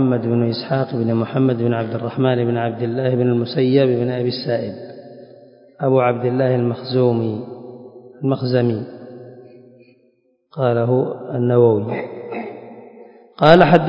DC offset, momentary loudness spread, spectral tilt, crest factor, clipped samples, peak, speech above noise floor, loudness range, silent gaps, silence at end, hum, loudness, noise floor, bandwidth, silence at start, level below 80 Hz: under 0.1%; 19 LU; -9.5 dB/octave; 18 dB; under 0.1%; 0 dBFS; 43 dB; 4 LU; none; 0 s; none; -18 LUFS; -60 dBFS; 5.4 kHz; 0 s; -56 dBFS